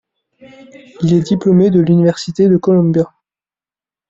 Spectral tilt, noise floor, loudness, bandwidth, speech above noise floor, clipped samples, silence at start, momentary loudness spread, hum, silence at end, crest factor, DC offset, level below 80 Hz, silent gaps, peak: -8.5 dB/octave; under -90 dBFS; -13 LUFS; 7.8 kHz; over 78 dB; under 0.1%; 1 s; 6 LU; none; 1 s; 12 dB; under 0.1%; -52 dBFS; none; -2 dBFS